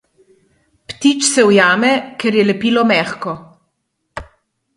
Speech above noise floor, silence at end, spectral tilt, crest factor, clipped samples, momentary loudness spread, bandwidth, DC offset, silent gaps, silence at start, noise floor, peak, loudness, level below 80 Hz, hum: 57 dB; 0.55 s; -3.5 dB/octave; 16 dB; under 0.1%; 22 LU; 11.5 kHz; under 0.1%; none; 0.9 s; -70 dBFS; 0 dBFS; -13 LUFS; -52 dBFS; none